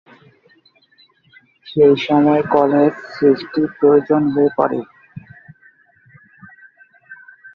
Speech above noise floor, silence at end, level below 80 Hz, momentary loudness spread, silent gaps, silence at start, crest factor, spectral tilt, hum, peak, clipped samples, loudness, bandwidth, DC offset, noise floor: 40 dB; 0.05 s; -60 dBFS; 10 LU; none; 1.65 s; 18 dB; -8.5 dB/octave; none; 0 dBFS; under 0.1%; -15 LUFS; 6 kHz; under 0.1%; -55 dBFS